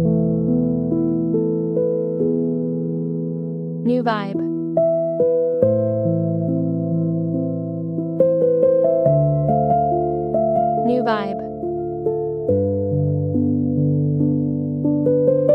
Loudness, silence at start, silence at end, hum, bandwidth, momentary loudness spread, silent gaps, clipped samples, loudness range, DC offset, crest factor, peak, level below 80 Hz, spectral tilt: -20 LUFS; 0 s; 0 s; none; 5.4 kHz; 7 LU; none; under 0.1%; 3 LU; under 0.1%; 16 dB; -2 dBFS; -48 dBFS; -11.5 dB/octave